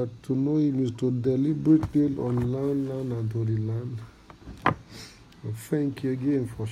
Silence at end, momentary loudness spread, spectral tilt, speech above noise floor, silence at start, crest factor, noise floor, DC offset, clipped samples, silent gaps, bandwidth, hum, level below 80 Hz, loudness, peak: 0 s; 17 LU; -8.5 dB/octave; 20 dB; 0 s; 20 dB; -46 dBFS; under 0.1%; under 0.1%; none; 13 kHz; none; -52 dBFS; -27 LUFS; -6 dBFS